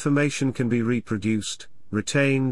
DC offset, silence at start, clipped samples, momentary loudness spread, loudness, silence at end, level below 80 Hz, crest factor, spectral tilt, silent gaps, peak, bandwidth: 0.7%; 0 s; under 0.1%; 9 LU; -24 LUFS; 0 s; -58 dBFS; 14 dB; -5.5 dB/octave; none; -10 dBFS; 12 kHz